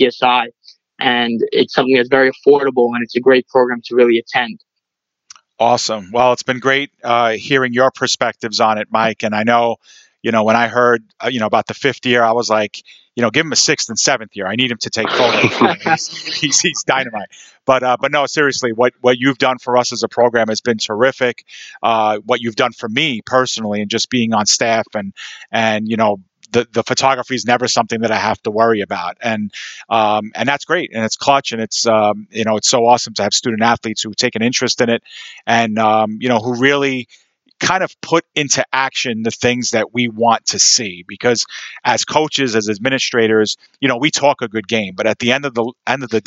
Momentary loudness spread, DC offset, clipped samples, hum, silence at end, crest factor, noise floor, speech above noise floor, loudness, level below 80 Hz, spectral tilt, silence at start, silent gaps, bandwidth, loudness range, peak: 7 LU; under 0.1%; under 0.1%; none; 0.05 s; 16 dB; -80 dBFS; 64 dB; -15 LUFS; -62 dBFS; -3 dB/octave; 0 s; none; 8.2 kHz; 2 LU; 0 dBFS